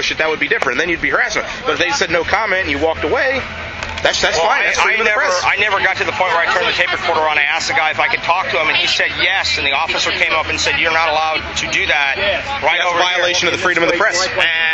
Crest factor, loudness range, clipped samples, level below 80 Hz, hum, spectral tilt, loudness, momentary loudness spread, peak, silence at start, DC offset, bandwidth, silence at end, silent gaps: 16 dB; 2 LU; under 0.1%; -42 dBFS; none; -2 dB/octave; -14 LUFS; 4 LU; 0 dBFS; 0 s; under 0.1%; 8.4 kHz; 0 s; none